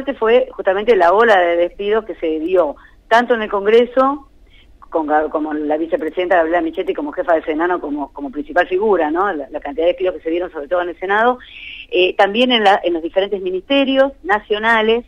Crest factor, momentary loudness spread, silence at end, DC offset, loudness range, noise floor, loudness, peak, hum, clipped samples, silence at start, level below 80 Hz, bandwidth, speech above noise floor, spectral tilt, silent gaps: 14 dB; 9 LU; 0.05 s; under 0.1%; 4 LU; -45 dBFS; -16 LUFS; -2 dBFS; none; under 0.1%; 0 s; -46 dBFS; 9 kHz; 29 dB; -5 dB/octave; none